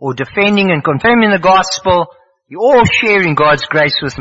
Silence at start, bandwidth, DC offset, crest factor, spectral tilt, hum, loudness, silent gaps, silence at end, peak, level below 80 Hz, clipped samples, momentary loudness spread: 0 s; 8 kHz; under 0.1%; 12 dB; -5 dB/octave; none; -11 LUFS; none; 0 s; 0 dBFS; -40 dBFS; under 0.1%; 5 LU